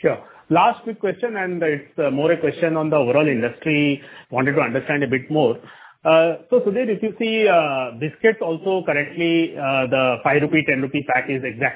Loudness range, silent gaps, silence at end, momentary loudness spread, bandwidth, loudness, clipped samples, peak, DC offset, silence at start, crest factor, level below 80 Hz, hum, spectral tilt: 1 LU; none; 0 s; 7 LU; 4 kHz; -20 LUFS; under 0.1%; -2 dBFS; under 0.1%; 0.05 s; 18 dB; -62 dBFS; none; -10 dB/octave